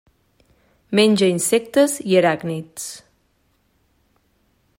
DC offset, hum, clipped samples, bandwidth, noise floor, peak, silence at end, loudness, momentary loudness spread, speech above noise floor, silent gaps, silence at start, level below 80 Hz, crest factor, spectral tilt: under 0.1%; none; under 0.1%; 16 kHz; -64 dBFS; -4 dBFS; 1.8 s; -18 LUFS; 16 LU; 46 dB; none; 0.9 s; -64 dBFS; 18 dB; -4 dB/octave